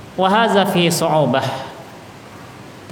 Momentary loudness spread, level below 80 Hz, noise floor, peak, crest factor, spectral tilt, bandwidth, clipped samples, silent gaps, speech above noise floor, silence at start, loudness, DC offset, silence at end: 23 LU; -58 dBFS; -37 dBFS; -2 dBFS; 16 dB; -4.5 dB/octave; 20 kHz; under 0.1%; none; 22 dB; 0 s; -16 LUFS; under 0.1%; 0 s